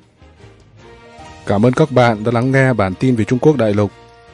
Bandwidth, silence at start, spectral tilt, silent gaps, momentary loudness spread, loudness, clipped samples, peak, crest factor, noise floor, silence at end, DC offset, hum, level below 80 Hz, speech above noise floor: 11 kHz; 1.2 s; -7.5 dB/octave; none; 7 LU; -14 LUFS; under 0.1%; 0 dBFS; 16 dB; -44 dBFS; 0.45 s; under 0.1%; none; -48 dBFS; 30 dB